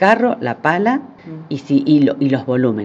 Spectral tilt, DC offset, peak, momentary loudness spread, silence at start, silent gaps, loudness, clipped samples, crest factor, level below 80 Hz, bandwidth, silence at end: -7.5 dB/octave; under 0.1%; 0 dBFS; 14 LU; 0 s; none; -16 LUFS; under 0.1%; 16 dB; -64 dBFS; 7.6 kHz; 0 s